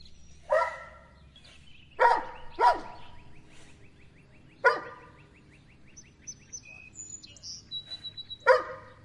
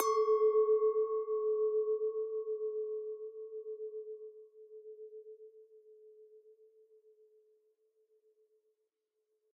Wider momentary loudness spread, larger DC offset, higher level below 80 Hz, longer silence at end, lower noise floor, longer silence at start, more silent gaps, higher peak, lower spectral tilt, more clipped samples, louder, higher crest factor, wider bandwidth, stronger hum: about the same, 22 LU vs 24 LU; neither; first, -58 dBFS vs under -90 dBFS; second, 0.15 s vs 3.15 s; second, -56 dBFS vs -84 dBFS; about the same, 0 s vs 0 s; neither; first, -8 dBFS vs -14 dBFS; first, -2 dB/octave vs 0 dB/octave; neither; first, -28 LUFS vs -34 LUFS; about the same, 24 dB vs 24 dB; first, 11 kHz vs 5.4 kHz; neither